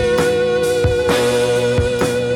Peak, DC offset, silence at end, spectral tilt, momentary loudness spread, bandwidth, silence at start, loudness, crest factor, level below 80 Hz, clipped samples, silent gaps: -2 dBFS; under 0.1%; 0 s; -5 dB/octave; 2 LU; 16.5 kHz; 0 s; -16 LUFS; 12 dB; -32 dBFS; under 0.1%; none